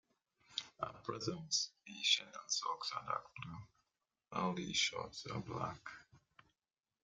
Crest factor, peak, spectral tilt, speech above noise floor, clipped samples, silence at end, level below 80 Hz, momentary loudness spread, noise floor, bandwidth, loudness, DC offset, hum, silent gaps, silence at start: 26 dB; -18 dBFS; -2 dB/octave; over 49 dB; under 0.1%; 0.85 s; -74 dBFS; 16 LU; under -90 dBFS; 11.5 kHz; -40 LUFS; under 0.1%; none; none; 0.5 s